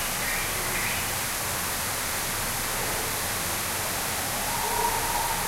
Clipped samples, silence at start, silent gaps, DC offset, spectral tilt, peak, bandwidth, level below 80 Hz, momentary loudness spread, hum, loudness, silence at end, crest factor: under 0.1%; 0 s; none; under 0.1%; -1.5 dB/octave; -12 dBFS; 16 kHz; -42 dBFS; 2 LU; none; -26 LUFS; 0 s; 16 dB